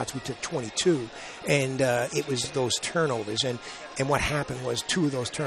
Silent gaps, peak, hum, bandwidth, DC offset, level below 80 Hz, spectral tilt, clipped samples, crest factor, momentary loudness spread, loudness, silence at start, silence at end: none; -8 dBFS; none; 13 kHz; under 0.1%; -52 dBFS; -4 dB/octave; under 0.1%; 18 dB; 8 LU; -27 LUFS; 0 s; 0 s